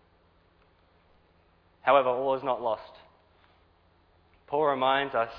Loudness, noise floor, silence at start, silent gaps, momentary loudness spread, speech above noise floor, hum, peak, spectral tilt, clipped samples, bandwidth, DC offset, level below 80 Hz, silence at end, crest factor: -27 LUFS; -64 dBFS; 1.85 s; none; 10 LU; 38 dB; none; -8 dBFS; -7 dB/octave; under 0.1%; 5.2 kHz; under 0.1%; -66 dBFS; 0 s; 22 dB